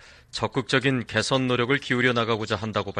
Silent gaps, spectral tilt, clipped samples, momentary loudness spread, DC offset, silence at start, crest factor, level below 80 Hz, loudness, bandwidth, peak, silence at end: none; -5 dB/octave; under 0.1%; 6 LU; under 0.1%; 0.35 s; 18 dB; -56 dBFS; -24 LUFS; 11 kHz; -6 dBFS; 0 s